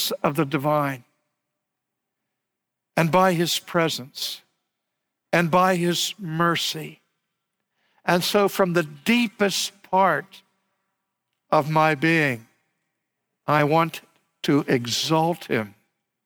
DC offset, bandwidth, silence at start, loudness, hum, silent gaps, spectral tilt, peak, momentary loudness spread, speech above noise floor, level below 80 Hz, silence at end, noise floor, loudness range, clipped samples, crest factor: under 0.1%; over 20 kHz; 0 s; -22 LUFS; none; none; -4.5 dB/octave; -6 dBFS; 11 LU; 61 dB; -68 dBFS; 0.55 s; -83 dBFS; 2 LU; under 0.1%; 18 dB